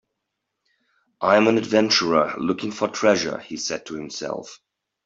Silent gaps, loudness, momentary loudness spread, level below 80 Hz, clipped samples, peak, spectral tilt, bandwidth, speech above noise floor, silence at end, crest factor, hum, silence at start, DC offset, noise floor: none; -21 LUFS; 13 LU; -64 dBFS; under 0.1%; -2 dBFS; -3.5 dB/octave; 7.8 kHz; 59 dB; 0.5 s; 20 dB; none; 1.2 s; under 0.1%; -80 dBFS